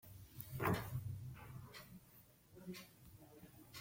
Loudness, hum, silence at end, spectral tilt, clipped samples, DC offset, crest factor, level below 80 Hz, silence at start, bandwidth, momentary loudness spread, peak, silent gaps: -47 LUFS; none; 0 s; -6 dB/octave; under 0.1%; under 0.1%; 24 dB; -66 dBFS; 0.05 s; 16.5 kHz; 21 LU; -24 dBFS; none